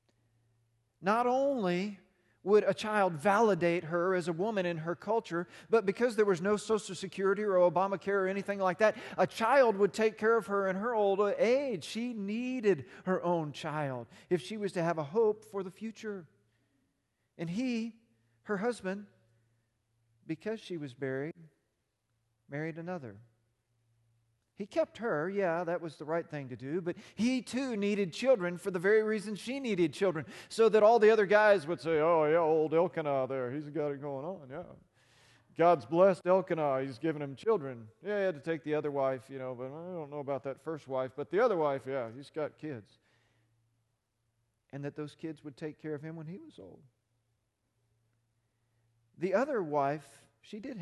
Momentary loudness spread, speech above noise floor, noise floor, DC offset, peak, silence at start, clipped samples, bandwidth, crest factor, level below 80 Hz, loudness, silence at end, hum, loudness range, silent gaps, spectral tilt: 15 LU; 50 dB; -81 dBFS; under 0.1%; -12 dBFS; 1 s; under 0.1%; 12 kHz; 20 dB; -76 dBFS; -31 LUFS; 0 s; none; 16 LU; none; -6 dB/octave